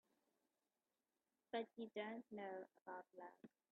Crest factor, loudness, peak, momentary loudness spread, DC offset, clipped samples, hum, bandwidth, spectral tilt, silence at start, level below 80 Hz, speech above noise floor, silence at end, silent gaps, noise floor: 20 dB; -53 LUFS; -34 dBFS; 11 LU; under 0.1%; under 0.1%; none; 4.2 kHz; -3 dB/octave; 1.55 s; under -90 dBFS; over 37 dB; 0.25 s; 2.82-2.86 s; under -90 dBFS